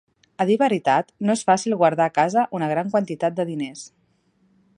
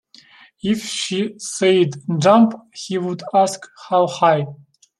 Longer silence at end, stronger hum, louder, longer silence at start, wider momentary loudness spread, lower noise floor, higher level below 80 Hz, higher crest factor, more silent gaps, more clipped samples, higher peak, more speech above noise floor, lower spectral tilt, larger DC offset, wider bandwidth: first, 0.9 s vs 0.45 s; neither; second, -21 LUFS vs -18 LUFS; second, 0.4 s vs 0.65 s; second, 8 LU vs 12 LU; first, -64 dBFS vs -48 dBFS; second, -70 dBFS vs -64 dBFS; about the same, 18 dB vs 18 dB; neither; neither; about the same, -4 dBFS vs -2 dBFS; first, 43 dB vs 30 dB; about the same, -5.5 dB/octave vs -5 dB/octave; neither; second, 11 kHz vs 13 kHz